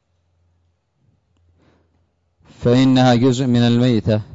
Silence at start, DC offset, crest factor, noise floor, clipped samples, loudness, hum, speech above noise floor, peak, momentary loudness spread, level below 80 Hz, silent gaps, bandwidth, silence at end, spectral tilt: 2.6 s; under 0.1%; 14 dB; -64 dBFS; under 0.1%; -15 LUFS; none; 50 dB; -4 dBFS; 5 LU; -48 dBFS; none; 8 kHz; 0.1 s; -7 dB/octave